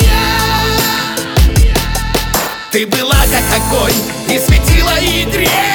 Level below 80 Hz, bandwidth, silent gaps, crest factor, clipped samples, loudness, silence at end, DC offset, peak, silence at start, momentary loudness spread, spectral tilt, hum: -16 dBFS; over 20 kHz; none; 10 dB; under 0.1%; -12 LUFS; 0 s; 0.1%; 0 dBFS; 0 s; 5 LU; -3.5 dB/octave; none